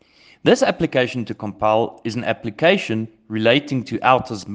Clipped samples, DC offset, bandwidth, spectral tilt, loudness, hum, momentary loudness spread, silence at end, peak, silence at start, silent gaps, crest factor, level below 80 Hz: under 0.1%; under 0.1%; 9.6 kHz; -5.5 dB/octave; -19 LUFS; none; 9 LU; 0 s; 0 dBFS; 0.45 s; none; 20 dB; -54 dBFS